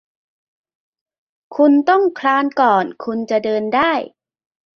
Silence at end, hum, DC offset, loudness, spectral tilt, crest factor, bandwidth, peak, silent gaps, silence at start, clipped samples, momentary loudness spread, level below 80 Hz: 0.7 s; none; under 0.1%; -16 LUFS; -6 dB/octave; 16 dB; 6.8 kHz; -2 dBFS; none; 1.5 s; under 0.1%; 10 LU; -64 dBFS